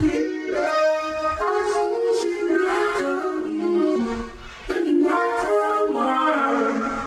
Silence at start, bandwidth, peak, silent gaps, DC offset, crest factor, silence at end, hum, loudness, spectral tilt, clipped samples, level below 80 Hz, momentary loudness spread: 0 s; 12.5 kHz; -10 dBFS; none; under 0.1%; 12 dB; 0 s; none; -22 LUFS; -5 dB/octave; under 0.1%; -46 dBFS; 5 LU